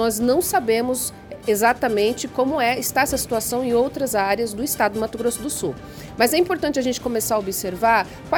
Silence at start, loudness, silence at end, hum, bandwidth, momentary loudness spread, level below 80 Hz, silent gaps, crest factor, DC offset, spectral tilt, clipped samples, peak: 0 s; -21 LUFS; 0 s; none; 18 kHz; 7 LU; -48 dBFS; none; 18 dB; under 0.1%; -3.5 dB/octave; under 0.1%; -2 dBFS